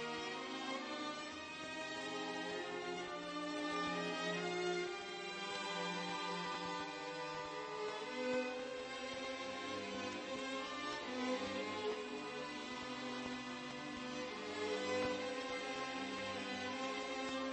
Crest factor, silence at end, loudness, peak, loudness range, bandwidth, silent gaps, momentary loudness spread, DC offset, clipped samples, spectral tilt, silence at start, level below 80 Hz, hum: 14 dB; 0 s; -43 LUFS; -28 dBFS; 2 LU; 8.4 kHz; none; 5 LU; under 0.1%; under 0.1%; -3.5 dB/octave; 0 s; -76 dBFS; none